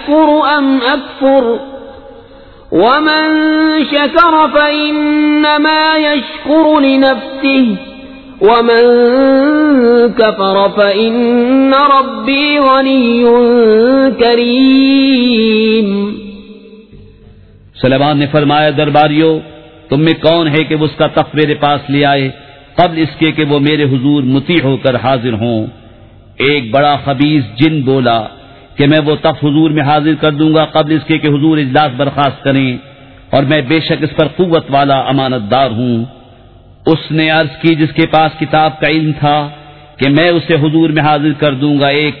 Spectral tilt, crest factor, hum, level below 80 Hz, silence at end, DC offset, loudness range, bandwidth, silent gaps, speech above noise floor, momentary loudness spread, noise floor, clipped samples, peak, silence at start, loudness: -9 dB/octave; 10 dB; none; -42 dBFS; 0 s; 0.4%; 4 LU; 4.6 kHz; none; 29 dB; 6 LU; -39 dBFS; under 0.1%; 0 dBFS; 0 s; -10 LUFS